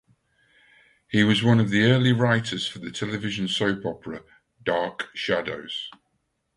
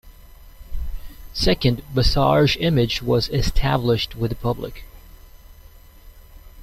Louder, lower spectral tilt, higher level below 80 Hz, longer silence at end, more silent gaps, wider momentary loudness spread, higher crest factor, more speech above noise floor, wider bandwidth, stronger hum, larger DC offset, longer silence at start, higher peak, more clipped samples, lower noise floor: second, -24 LUFS vs -20 LUFS; about the same, -6 dB/octave vs -6 dB/octave; second, -58 dBFS vs -30 dBFS; first, 0.65 s vs 0 s; neither; second, 14 LU vs 18 LU; about the same, 20 dB vs 18 dB; first, 50 dB vs 26 dB; second, 11 kHz vs 15.5 kHz; neither; neither; first, 1.1 s vs 0.05 s; about the same, -6 dBFS vs -4 dBFS; neither; first, -74 dBFS vs -45 dBFS